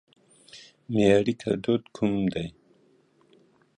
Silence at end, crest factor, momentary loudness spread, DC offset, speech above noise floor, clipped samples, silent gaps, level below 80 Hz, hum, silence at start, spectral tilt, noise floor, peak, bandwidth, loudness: 1.25 s; 20 dB; 25 LU; under 0.1%; 38 dB; under 0.1%; none; -56 dBFS; none; 0.55 s; -7 dB/octave; -62 dBFS; -6 dBFS; 10.5 kHz; -25 LUFS